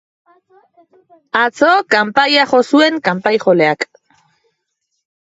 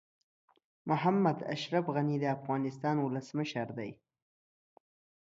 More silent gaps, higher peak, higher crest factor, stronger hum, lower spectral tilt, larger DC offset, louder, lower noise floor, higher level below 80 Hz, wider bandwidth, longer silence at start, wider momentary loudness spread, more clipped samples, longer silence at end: neither; first, 0 dBFS vs -16 dBFS; about the same, 16 dB vs 20 dB; neither; second, -4.5 dB/octave vs -7 dB/octave; neither; first, -13 LUFS vs -33 LUFS; second, -71 dBFS vs under -90 dBFS; first, -66 dBFS vs -76 dBFS; about the same, 8 kHz vs 7.8 kHz; first, 1.35 s vs 0.85 s; second, 6 LU vs 10 LU; neither; about the same, 1.5 s vs 1.4 s